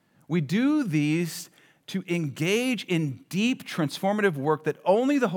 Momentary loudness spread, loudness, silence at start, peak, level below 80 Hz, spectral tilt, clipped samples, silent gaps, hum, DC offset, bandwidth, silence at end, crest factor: 7 LU; -26 LUFS; 0.3 s; -10 dBFS; -86 dBFS; -6 dB/octave; under 0.1%; none; none; under 0.1%; 19 kHz; 0 s; 16 dB